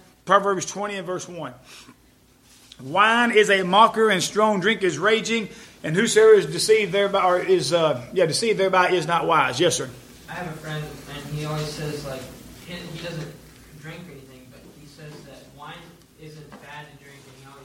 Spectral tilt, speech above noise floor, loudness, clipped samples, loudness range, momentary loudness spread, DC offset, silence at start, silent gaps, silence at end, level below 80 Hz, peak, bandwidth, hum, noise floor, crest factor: -3.5 dB/octave; 35 dB; -20 LUFS; under 0.1%; 19 LU; 24 LU; under 0.1%; 0.25 s; none; 0.1 s; -56 dBFS; -2 dBFS; 16 kHz; none; -56 dBFS; 20 dB